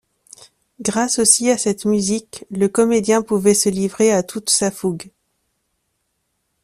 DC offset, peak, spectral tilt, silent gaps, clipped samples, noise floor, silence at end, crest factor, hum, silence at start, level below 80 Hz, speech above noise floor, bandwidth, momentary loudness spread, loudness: under 0.1%; 0 dBFS; -3.5 dB/octave; none; under 0.1%; -71 dBFS; 1.55 s; 20 dB; none; 0.8 s; -56 dBFS; 54 dB; 14.5 kHz; 12 LU; -17 LUFS